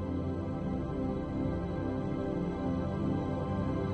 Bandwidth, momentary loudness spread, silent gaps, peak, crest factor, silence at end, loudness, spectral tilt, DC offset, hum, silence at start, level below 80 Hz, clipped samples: 8.4 kHz; 2 LU; none; -20 dBFS; 12 dB; 0 s; -34 LUFS; -9.5 dB/octave; under 0.1%; none; 0 s; -46 dBFS; under 0.1%